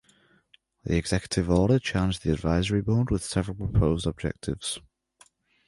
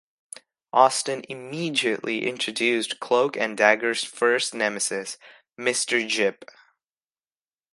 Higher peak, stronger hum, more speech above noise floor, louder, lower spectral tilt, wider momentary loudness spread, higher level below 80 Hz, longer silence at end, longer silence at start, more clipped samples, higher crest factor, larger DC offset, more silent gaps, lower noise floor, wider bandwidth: second, -8 dBFS vs -2 dBFS; neither; second, 38 dB vs over 66 dB; second, -26 LUFS vs -23 LUFS; first, -6 dB/octave vs -2 dB/octave; second, 9 LU vs 15 LU; first, -38 dBFS vs -76 dBFS; second, 0.9 s vs 1.3 s; about the same, 0.85 s vs 0.75 s; neither; second, 18 dB vs 24 dB; neither; neither; second, -63 dBFS vs under -90 dBFS; about the same, 11.5 kHz vs 11.5 kHz